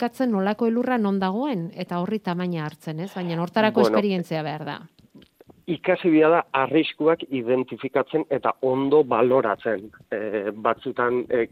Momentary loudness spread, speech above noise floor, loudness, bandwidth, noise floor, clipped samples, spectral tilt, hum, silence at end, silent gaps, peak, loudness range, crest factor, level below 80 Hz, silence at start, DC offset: 11 LU; 29 dB; -23 LUFS; 14.5 kHz; -52 dBFS; under 0.1%; -7.5 dB/octave; none; 0.05 s; none; -4 dBFS; 3 LU; 20 dB; -68 dBFS; 0 s; under 0.1%